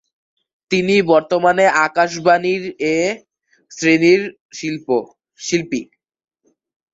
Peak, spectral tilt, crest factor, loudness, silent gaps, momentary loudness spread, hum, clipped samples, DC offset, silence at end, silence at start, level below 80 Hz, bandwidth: -2 dBFS; -4.5 dB/octave; 16 dB; -16 LUFS; 4.41-4.49 s; 12 LU; none; under 0.1%; under 0.1%; 1.1 s; 0.7 s; -60 dBFS; 8 kHz